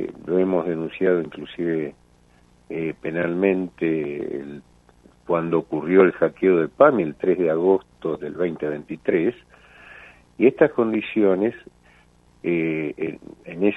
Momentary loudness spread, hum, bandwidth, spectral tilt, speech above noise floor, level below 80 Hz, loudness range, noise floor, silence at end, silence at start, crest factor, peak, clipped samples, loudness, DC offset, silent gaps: 13 LU; 60 Hz at -55 dBFS; 4 kHz; -9 dB/octave; 34 dB; -60 dBFS; 6 LU; -56 dBFS; 0 s; 0 s; 20 dB; -2 dBFS; under 0.1%; -22 LUFS; under 0.1%; none